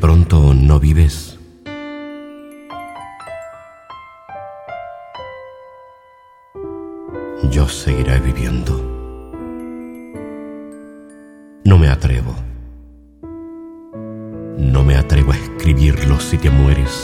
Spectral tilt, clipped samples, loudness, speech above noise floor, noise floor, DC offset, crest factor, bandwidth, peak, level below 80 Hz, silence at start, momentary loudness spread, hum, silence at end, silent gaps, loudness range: -7 dB/octave; under 0.1%; -15 LUFS; 34 dB; -47 dBFS; under 0.1%; 16 dB; 13.5 kHz; 0 dBFS; -20 dBFS; 0 s; 23 LU; none; 0 s; none; 17 LU